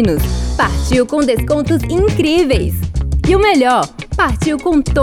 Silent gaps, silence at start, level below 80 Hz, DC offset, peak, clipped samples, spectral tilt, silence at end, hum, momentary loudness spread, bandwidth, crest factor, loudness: none; 0 s; -22 dBFS; under 0.1%; 0 dBFS; under 0.1%; -6 dB/octave; 0 s; none; 6 LU; 16.5 kHz; 14 dB; -14 LUFS